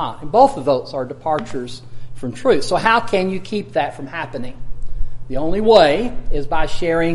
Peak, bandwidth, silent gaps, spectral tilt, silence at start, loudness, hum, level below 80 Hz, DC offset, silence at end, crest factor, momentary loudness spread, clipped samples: 0 dBFS; 11.5 kHz; none; -5.5 dB/octave; 0 s; -18 LUFS; none; -28 dBFS; under 0.1%; 0 s; 16 dB; 20 LU; under 0.1%